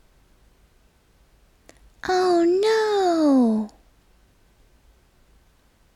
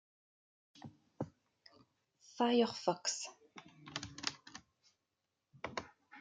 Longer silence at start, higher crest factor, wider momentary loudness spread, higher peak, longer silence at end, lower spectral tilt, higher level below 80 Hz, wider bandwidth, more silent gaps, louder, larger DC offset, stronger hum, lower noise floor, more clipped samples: first, 2.05 s vs 0.75 s; second, 14 dB vs 26 dB; second, 10 LU vs 24 LU; first, -10 dBFS vs -16 dBFS; first, 2.25 s vs 0 s; first, -5 dB/octave vs -3.5 dB/octave; first, -58 dBFS vs -78 dBFS; first, 12.5 kHz vs 9.6 kHz; neither; first, -20 LUFS vs -39 LUFS; neither; neither; second, -59 dBFS vs -88 dBFS; neither